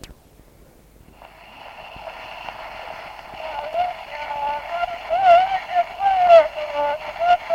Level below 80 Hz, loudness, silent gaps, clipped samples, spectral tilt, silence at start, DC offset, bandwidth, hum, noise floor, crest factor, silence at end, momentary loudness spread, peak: -52 dBFS; -19 LUFS; none; under 0.1%; -3.5 dB/octave; 0.05 s; under 0.1%; 8.8 kHz; none; -50 dBFS; 20 dB; 0 s; 22 LU; -2 dBFS